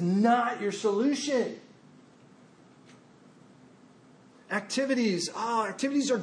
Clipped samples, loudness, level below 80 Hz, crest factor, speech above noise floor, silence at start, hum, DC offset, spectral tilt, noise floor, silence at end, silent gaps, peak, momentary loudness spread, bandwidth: under 0.1%; -28 LUFS; -84 dBFS; 18 dB; 29 dB; 0 s; none; under 0.1%; -4.5 dB/octave; -56 dBFS; 0 s; none; -12 dBFS; 9 LU; 10.5 kHz